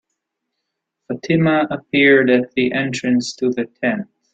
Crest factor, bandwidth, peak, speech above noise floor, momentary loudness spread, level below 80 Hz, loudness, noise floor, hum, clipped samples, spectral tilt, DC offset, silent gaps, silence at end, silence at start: 16 dB; 9 kHz; -2 dBFS; 61 dB; 9 LU; -60 dBFS; -17 LUFS; -78 dBFS; none; under 0.1%; -5.5 dB/octave; under 0.1%; none; 0.3 s; 1.1 s